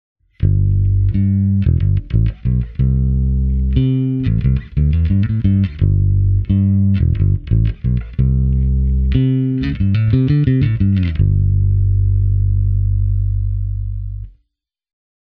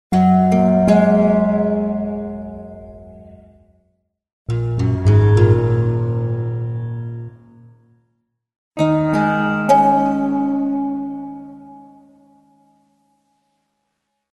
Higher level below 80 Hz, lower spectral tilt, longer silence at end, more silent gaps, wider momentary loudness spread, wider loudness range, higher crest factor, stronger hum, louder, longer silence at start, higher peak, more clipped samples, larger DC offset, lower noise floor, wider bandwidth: first, -20 dBFS vs -42 dBFS; first, -11.5 dB/octave vs -9 dB/octave; second, 1.05 s vs 2.55 s; second, none vs 4.33-4.45 s, 8.58-8.71 s; second, 5 LU vs 20 LU; second, 2 LU vs 9 LU; about the same, 14 dB vs 18 dB; neither; about the same, -16 LUFS vs -17 LUFS; first, 0.4 s vs 0.1 s; about the same, 0 dBFS vs 0 dBFS; neither; neither; about the same, -72 dBFS vs -73 dBFS; second, 4.4 kHz vs 11.5 kHz